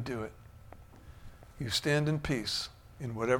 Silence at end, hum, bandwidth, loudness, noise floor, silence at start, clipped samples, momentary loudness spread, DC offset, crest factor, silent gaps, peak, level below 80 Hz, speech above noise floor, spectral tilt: 0 s; none; 18 kHz; -33 LUFS; -52 dBFS; 0 s; under 0.1%; 25 LU; under 0.1%; 22 dB; none; -14 dBFS; -54 dBFS; 20 dB; -4.5 dB/octave